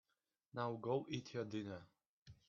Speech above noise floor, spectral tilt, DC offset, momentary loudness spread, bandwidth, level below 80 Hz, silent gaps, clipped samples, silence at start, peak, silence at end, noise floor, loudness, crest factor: 45 dB; -5.5 dB/octave; under 0.1%; 11 LU; 7 kHz; -80 dBFS; 2.07-2.26 s; under 0.1%; 0.55 s; -26 dBFS; 0.15 s; -89 dBFS; -45 LUFS; 20 dB